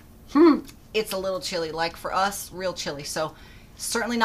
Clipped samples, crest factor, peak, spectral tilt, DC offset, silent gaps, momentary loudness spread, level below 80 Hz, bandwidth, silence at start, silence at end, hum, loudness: under 0.1%; 20 dB; -6 dBFS; -3.5 dB/octave; under 0.1%; none; 12 LU; -52 dBFS; 15.5 kHz; 0.05 s; 0 s; none; -25 LUFS